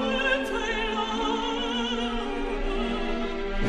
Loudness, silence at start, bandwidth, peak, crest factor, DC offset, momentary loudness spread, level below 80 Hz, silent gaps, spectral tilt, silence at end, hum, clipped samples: -28 LUFS; 0 s; 11 kHz; -12 dBFS; 14 dB; under 0.1%; 6 LU; -34 dBFS; none; -4 dB/octave; 0 s; none; under 0.1%